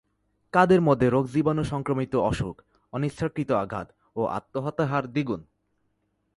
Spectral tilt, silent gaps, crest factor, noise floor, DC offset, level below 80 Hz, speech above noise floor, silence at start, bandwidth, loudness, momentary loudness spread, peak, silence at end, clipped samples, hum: -7.5 dB/octave; none; 20 dB; -73 dBFS; under 0.1%; -50 dBFS; 49 dB; 0.55 s; 11.5 kHz; -25 LUFS; 14 LU; -6 dBFS; 0.95 s; under 0.1%; none